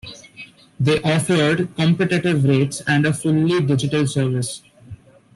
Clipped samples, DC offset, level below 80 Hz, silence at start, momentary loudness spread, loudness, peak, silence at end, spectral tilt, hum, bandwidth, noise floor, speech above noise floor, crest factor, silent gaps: under 0.1%; under 0.1%; -52 dBFS; 0.05 s; 15 LU; -19 LUFS; -4 dBFS; 0.4 s; -6 dB/octave; none; 12.5 kHz; -43 dBFS; 25 dB; 14 dB; none